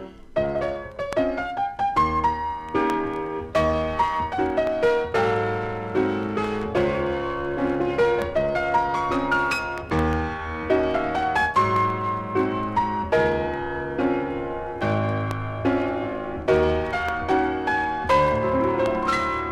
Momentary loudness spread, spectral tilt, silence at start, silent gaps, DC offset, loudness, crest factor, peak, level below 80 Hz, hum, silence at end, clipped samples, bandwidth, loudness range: 7 LU; -6.5 dB/octave; 0 s; none; under 0.1%; -24 LUFS; 16 dB; -8 dBFS; -42 dBFS; none; 0 s; under 0.1%; 13.5 kHz; 2 LU